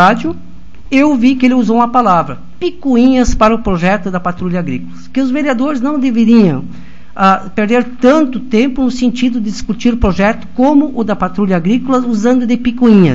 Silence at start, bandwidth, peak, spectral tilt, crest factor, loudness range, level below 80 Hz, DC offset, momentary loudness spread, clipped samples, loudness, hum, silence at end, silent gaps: 0 s; 7.8 kHz; 0 dBFS; -6.5 dB/octave; 12 dB; 2 LU; -30 dBFS; 6%; 9 LU; 0.4%; -12 LUFS; none; 0 s; none